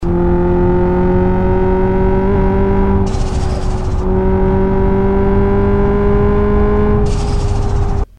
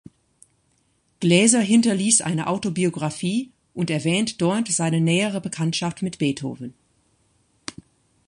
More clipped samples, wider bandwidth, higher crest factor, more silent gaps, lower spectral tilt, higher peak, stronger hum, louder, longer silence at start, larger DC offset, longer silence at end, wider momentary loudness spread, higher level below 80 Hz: neither; second, 9.4 kHz vs 11 kHz; second, 10 dB vs 22 dB; neither; first, -8.5 dB/octave vs -4 dB/octave; about the same, -2 dBFS vs -2 dBFS; neither; first, -14 LUFS vs -21 LUFS; second, 0 s vs 1.2 s; first, 3% vs under 0.1%; second, 0 s vs 0.55 s; second, 5 LU vs 19 LU; first, -16 dBFS vs -62 dBFS